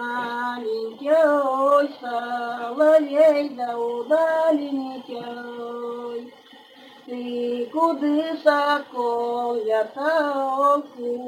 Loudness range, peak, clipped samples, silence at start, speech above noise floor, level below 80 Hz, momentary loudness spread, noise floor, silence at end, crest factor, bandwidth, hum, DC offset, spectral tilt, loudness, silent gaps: 8 LU; -4 dBFS; under 0.1%; 0 s; 26 dB; -82 dBFS; 15 LU; -48 dBFS; 0 s; 18 dB; 16 kHz; none; under 0.1%; -4.5 dB/octave; -22 LUFS; none